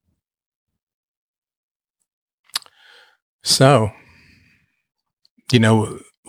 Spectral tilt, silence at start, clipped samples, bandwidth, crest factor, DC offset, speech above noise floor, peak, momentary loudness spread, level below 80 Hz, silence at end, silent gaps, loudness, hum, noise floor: -5 dB/octave; 2.55 s; under 0.1%; 16 kHz; 22 dB; under 0.1%; 46 dB; -2 dBFS; 15 LU; -58 dBFS; 0.3 s; 3.22-3.39 s, 5.13-5.17 s, 5.30-5.37 s; -17 LUFS; none; -60 dBFS